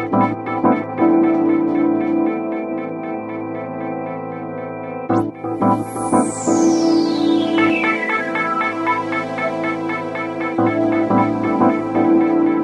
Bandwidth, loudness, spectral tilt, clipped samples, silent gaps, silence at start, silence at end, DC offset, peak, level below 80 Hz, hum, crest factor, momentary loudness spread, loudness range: 11.5 kHz; -18 LUFS; -5.5 dB/octave; under 0.1%; none; 0 s; 0 s; under 0.1%; -2 dBFS; -58 dBFS; none; 14 dB; 11 LU; 6 LU